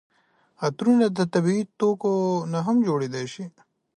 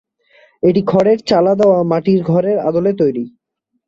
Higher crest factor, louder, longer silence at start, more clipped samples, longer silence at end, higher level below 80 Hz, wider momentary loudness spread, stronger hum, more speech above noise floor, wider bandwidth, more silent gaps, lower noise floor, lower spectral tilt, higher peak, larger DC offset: about the same, 16 dB vs 14 dB; second, -23 LUFS vs -14 LUFS; about the same, 0.6 s vs 0.65 s; neither; about the same, 0.5 s vs 0.6 s; second, -70 dBFS vs -54 dBFS; first, 12 LU vs 5 LU; neither; second, 40 dB vs 58 dB; first, 11 kHz vs 7.8 kHz; neither; second, -62 dBFS vs -71 dBFS; about the same, -7 dB/octave vs -8 dB/octave; second, -8 dBFS vs 0 dBFS; neither